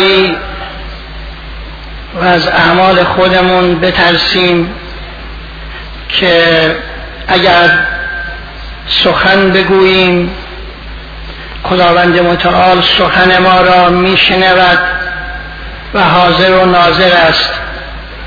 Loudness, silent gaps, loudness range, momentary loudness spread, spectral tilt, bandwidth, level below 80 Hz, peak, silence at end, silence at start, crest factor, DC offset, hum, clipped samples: -7 LUFS; none; 4 LU; 20 LU; -6 dB/octave; 5.4 kHz; -28 dBFS; 0 dBFS; 0 s; 0 s; 10 dB; under 0.1%; none; 0.3%